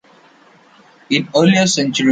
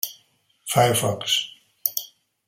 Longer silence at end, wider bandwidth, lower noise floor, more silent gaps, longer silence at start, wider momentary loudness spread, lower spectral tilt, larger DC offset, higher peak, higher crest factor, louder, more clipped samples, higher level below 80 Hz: second, 0 s vs 0.4 s; second, 9.2 kHz vs 17 kHz; second, -48 dBFS vs -62 dBFS; neither; first, 1.1 s vs 0.05 s; second, 7 LU vs 18 LU; first, -4.5 dB/octave vs -3 dB/octave; neither; about the same, -2 dBFS vs -2 dBFS; second, 16 dB vs 22 dB; first, -14 LUFS vs -23 LUFS; neither; about the same, -60 dBFS vs -62 dBFS